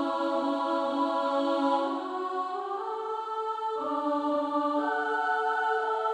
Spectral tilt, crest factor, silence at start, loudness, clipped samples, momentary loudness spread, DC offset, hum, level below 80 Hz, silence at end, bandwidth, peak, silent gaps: -3.5 dB/octave; 14 dB; 0 s; -29 LUFS; under 0.1%; 6 LU; under 0.1%; none; -80 dBFS; 0 s; 10.5 kHz; -14 dBFS; none